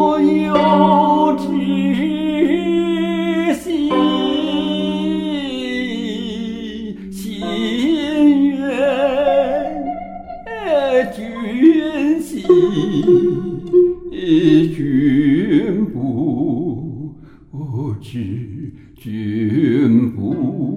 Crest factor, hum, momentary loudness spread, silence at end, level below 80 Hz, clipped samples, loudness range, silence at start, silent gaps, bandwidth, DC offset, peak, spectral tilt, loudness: 16 dB; none; 14 LU; 0 s; -46 dBFS; under 0.1%; 7 LU; 0 s; none; 13 kHz; under 0.1%; 0 dBFS; -7 dB/octave; -17 LUFS